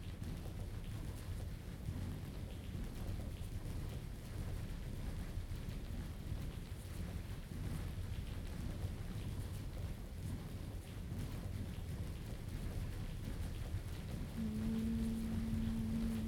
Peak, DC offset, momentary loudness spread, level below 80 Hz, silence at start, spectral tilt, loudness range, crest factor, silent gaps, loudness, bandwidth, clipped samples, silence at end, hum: -28 dBFS; under 0.1%; 7 LU; -48 dBFS; 0 s; -6.5 dB/octave; 4 LU; 14 dB; none; -45 LUFS; 18 kHz; under 0.1%; 0 s; none